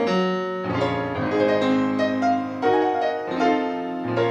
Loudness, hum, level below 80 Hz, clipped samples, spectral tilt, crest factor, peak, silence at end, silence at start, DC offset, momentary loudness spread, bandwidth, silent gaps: -23 LUFS; none; -60 dBFS; under 0.1%; -6.5 dB/octave; 14 dB; -8 dBFS; 0 s; 0 s; under 0.1%; 6 LU; 8.4 kHz; none